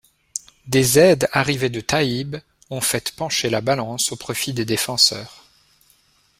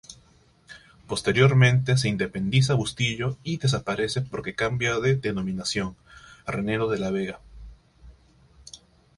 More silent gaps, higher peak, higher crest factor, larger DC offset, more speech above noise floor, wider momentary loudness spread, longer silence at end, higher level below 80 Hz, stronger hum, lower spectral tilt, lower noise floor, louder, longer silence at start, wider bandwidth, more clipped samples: neither; first, -2 dBFS vs -6 dBFS; about the same, 20 dB vs 20 dB; neither; first, 39 dB vs 34 dB; first, 17 LU vs 14 LU; first, 1.05 s vs 0.4 s; about the same, -52 dBFS vs -50 dBFS; neither; second, -3.5 dB/octave vs -5.5 dB/octave; about the same, -59 dBFS vs -58 dBFS; first, -19 LUFS vs -24 LUFS; first, 0.35 s vs 0.1 s; first, 16 kHz vs 11.5 kHz; neither